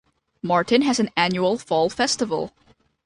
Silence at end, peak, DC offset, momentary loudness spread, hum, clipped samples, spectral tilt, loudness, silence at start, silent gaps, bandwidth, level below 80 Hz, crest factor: 0.55 s; -4 dBFS; under 0.1%; 9 LU; none; under 0.1%; -4 dB/octave; -21 LUFS; 0.45 s; none; 11.5 kHz; -58 dBFS; 18 dB